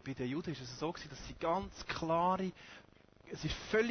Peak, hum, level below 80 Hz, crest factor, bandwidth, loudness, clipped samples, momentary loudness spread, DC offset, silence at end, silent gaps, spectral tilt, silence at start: -18 dBFS; none; -56 dBFS; 20 dB; 6.6 kHz; -38 LUFS; under 0.1%; 17 LU; under 0.1%; 0 s; none; -5.5 dB/octave; 0.05 s